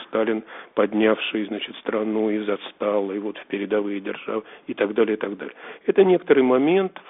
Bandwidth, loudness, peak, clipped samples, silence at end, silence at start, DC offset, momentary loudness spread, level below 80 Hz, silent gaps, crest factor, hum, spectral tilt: 4 kHz; -23 LUFS; -4 dBFS; under 0.1%; 0.1 s; 0 s; under 0.1%; 12 LU; -70 dBFS; none; 20 dB; none; -4 dB/octave